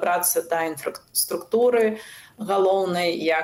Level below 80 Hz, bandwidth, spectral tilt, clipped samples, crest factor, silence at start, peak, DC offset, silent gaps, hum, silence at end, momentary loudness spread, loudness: -70 dBFS; 16 kHz; -3 dB/octave; under 0.1%; 14 dB; 0 s; -8 dBFS; under 0.1%; none; none; 0 s; 12 LU; -22 LUFS